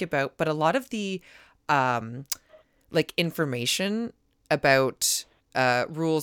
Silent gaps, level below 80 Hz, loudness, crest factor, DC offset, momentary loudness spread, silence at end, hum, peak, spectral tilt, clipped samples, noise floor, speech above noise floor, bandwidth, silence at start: none; -64 dBFS; -26 LUFS; 18 dB; under 0.1%; 12 LU; 0 s; none; -8 dBFS; -3.5 dB/octave; under 0.1%; -58 dBFS; 32 dB; 19 kHz; 0 s